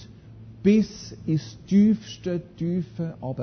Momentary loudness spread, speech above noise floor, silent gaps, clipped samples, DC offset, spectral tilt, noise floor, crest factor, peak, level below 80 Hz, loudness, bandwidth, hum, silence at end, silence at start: 12 LU; 21 dB; none; under 0.1%; under 0.1%; -7.5 dB/octave; -45 dBFS; 16 dB; -8 dBFS; -54 dBFS; -25 LUFS; 6.6 kHz; none; 0 s; 0 s